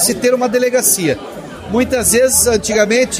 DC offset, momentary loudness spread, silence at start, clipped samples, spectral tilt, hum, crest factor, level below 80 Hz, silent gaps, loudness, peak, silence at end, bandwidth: under 0.1%; 11 LU; 0 s; under 0.1%; -2.5 dB/octave; none; 14 dB; -38 dBFS; none; -13 LUFS; 0 dBFS; 0 s; 16 kHz